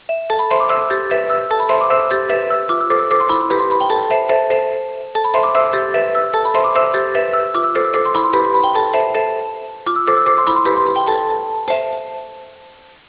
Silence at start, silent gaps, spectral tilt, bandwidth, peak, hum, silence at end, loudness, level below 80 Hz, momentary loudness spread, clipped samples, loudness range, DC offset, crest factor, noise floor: 0.1 s; none; -7.5 dB/octave; 4 kHz; -2 dBFS; none; 0.4 s; -16 LUFS; -56 dBFS; 7 LU; under 0.1%; 1 LU; under 0.1%; 14 dB; -44 dBFS